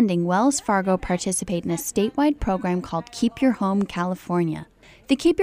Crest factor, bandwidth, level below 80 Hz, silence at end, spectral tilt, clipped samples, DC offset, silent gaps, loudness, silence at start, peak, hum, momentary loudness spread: 16 dB; 15.5 kHz; -44 dBFS; 0 s; -5.5 dB/octave; under 0.1%; under 0.1%; none; -23 LUFS; 0 s; -8 dBFS; none; 6 LU